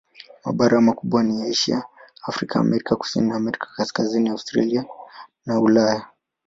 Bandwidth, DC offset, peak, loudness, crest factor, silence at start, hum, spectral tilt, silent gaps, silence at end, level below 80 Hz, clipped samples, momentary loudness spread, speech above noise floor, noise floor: 7.8 kHz; under 0.1%; -4 dBFS; -21 LUFS; 18 dB; 0.45 s; none; -5.5 dB/octave; none; 0.4 s; -58 dBFS; under 0.1%; 14 LU; 22 dB; -43 dBFS